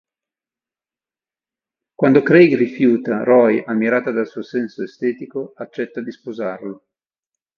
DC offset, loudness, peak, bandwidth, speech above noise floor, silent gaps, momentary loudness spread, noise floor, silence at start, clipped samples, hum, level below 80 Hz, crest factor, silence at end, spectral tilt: under 0.1%; -17 LUFS; 0 dBFS; 6.4 kHz; over 73 dB; none; 17 LU; under -90 dBFS; 2 s; under 0.1%; none; -66 dBFS; 18 dB; 0.85 s; -8.5 dB/octave